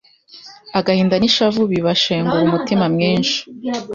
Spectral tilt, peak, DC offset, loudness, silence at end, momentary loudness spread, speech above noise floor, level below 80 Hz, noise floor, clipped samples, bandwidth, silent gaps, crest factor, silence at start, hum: -5.5 dB/octave; -2 dBFS; under 0.1%; -16 LUFS; 0 s; 9 LU; 26 dB; -52 dBFS; -42 dBFS; under 0.1%; 7.4 kHz; none; 14 dB; 0.35 s; none